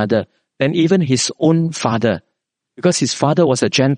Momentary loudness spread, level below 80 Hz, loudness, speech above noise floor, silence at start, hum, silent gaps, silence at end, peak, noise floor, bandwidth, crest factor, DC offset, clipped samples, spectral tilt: 6 LU; -58 dBFS; -16 LUFS; 46 dB; 0 s; none; none; 0 s; 0 dBFS; -61 dBFS; 10 kHz; 16 dB; under 0.1%; under 0.1%; -5 dB/octave